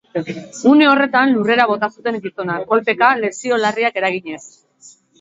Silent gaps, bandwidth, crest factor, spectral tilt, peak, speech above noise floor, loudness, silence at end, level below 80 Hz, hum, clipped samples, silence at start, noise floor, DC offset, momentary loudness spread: none; 8 kHz; 16 dB; -4.5 dB/octave; 0 dBFS; 31 dB; -16 LUFS; 0.35 s; -66 dBFS; none; under 0.1%; 0.15 s; -47 dBFS; under 0.1%; 13 LU